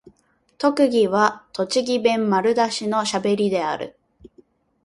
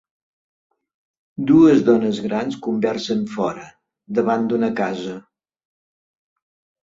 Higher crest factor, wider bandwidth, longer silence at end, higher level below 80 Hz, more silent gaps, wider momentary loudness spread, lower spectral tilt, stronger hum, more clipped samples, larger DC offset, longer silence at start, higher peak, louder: about the same, 18 dB vs 18 dB; first, 11.5 kHz vs 7.6 kHz; second, 0.95 s vs 1.65 s; about the same, -62 dBFS vs -60 dBFS; neither; second, 7 LU vs 17 LU; second, -4.5 dB/octave vs -7 dB/octave; neither; neither; neither; second, 0.6 s vs 1.4 s; about the same, -4 dBFS vs -2 dBFS; about the same, -20 LUFS vs -19 LUFS